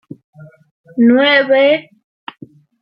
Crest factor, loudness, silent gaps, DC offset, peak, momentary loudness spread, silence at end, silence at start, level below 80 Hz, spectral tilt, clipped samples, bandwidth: 14 dB; -11 LUFS; 0.71-0.84 s; under 0.1%; -2 dBFS; 24 LU; 1 s; 0.4 s; -68 dBFS; -7.5 dB/octave; under 0.1%; 5.6 kHz